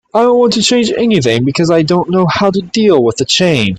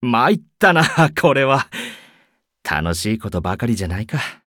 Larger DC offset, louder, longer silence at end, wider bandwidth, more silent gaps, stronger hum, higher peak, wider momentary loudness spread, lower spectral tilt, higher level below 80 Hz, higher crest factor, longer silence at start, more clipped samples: neither; first, -11 LUFS vs -18 LUFS; about the same, 0 s vs 0.1 s; second, 11 kHz vs 18.5 kHz; neither; neither; about the same, 0 dBFS vs -2 dBFS; second, 3 LU vs 11 LU; about the same, -5 dB/octave vs -5.5 dB/octave; about the same, -46 dBFS vs -42 dBFS; second, 10 dB vs 16 dB; first, 0.15 s vs 0 s; neither